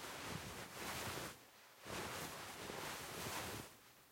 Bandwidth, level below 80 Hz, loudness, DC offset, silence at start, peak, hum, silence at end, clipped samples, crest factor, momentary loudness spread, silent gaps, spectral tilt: 16.5 kHz; -70 dBFS; -48 LUFS; under 0.1%; 0 s; -32 dBFS; none; 0 s; under 0.1%; 16 dB; 12 LU; none; -2.5 dB/octave